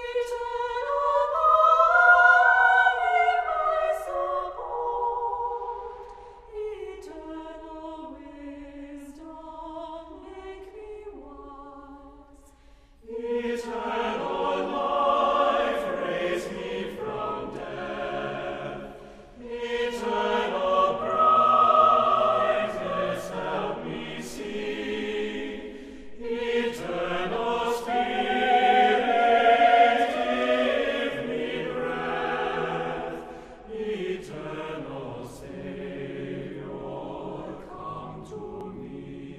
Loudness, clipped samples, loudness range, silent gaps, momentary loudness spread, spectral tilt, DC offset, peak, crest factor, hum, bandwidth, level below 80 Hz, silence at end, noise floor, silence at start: -24 LUFS; under 0.1%; 20 LU; none; 23 LU; -4.5 dB/octave; under 0.1%; -6 dBFS; 20 dB; none; 13.5 kHz; -54 dBFS; 0 s; -54 dBFS; 0 s